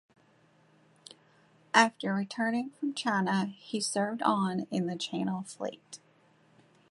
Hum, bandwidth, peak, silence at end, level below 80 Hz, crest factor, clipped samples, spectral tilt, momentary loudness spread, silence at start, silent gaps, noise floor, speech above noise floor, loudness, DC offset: none; 11.5 kHz; -6 dBFS; 0.95 s; -78 dBFS; 26 dB; under 0.1%; -4.5 dB/octave; 14 LU; 1.75 s; none; -65 dBFS; 34 dB; -31 LUFS; under 0.1%